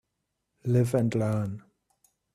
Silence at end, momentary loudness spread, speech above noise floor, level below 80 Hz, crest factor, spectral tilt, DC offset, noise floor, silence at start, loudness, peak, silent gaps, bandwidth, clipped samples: 0.75 s; 13 LU; 55 dB; -62 dBFS; 16 dB; -8 dB/octave; under 0.1%; -81 dBFS; 0.65 s; -28 LUFS; -12 dBFS; none; 13.5 kHz; under 0.1%